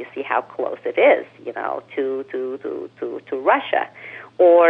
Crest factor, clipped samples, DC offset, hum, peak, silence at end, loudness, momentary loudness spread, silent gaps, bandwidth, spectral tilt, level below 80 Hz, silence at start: 16 dB; under 0.1%; under 0.1%; none; -4 dBFS; 0 s; -21 LUFS; 15 LU; none; 4 kHz; -6.5 dB/octave; -78 dBFS; 0 s